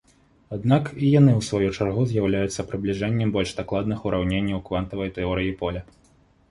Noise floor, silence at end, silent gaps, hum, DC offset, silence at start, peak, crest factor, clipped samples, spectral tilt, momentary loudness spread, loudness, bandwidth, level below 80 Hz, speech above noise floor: -58 dBFS; 0.65 s; none; none; under 0.1%; 0.5 s; -4 dBFS; 18 dB; under 0.1%; -7 dB/octave; 10 LU; -23 LUFS; 11.5 kHz; -44 dBFS; 36 dB